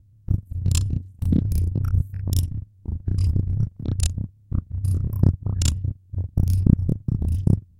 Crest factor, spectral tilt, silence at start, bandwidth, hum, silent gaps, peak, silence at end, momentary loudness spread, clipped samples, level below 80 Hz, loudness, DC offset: 20 dB; -6.5 dB/octave; 0.3 s; 16 kHz; none; none; -2 dBFS; 0.2 s; 9 LU; under 0.1%; -30 dBFS; -24 LUFS; under 0.1%